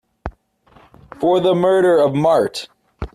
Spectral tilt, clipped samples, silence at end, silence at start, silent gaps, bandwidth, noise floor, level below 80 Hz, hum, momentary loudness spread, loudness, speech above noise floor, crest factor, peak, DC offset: -6.5 dB/octave; under 0.1%; 0.1 s; 0.25 s; none; 13 kHz; -52 dBFS; -42 dBFS; none; 21 LU; -15 LUFS; 38 dB; 14 dB; -4 dBFS; under 0.1%